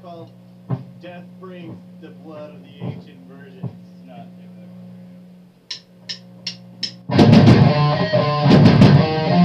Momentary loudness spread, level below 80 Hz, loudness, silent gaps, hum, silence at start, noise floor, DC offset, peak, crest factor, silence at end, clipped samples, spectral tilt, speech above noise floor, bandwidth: 27 LU; -42 dBFS; -13 LUFS; none; 60 Hz at -45 dBFS; 0.05 s; -45 dBFS; under 0.1%; -2 dBFS; 16 dB; 0 s; under 0.1%; -8 dB/octave; 10 dB; 8 kHz